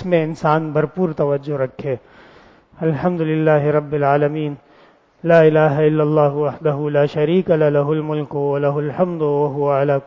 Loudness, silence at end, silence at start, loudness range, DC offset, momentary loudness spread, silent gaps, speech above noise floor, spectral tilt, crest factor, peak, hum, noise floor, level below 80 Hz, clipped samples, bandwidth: -18 LUFS; 0.05 s; 0 s; 4 LU; under 0.1%; 8 LU; none; 34 dB; -9.5 dB/octave; 16 dB; -2 dBFS; none; -51 dBFS; -56 dBFS; under 0.1%; 7.2 kHz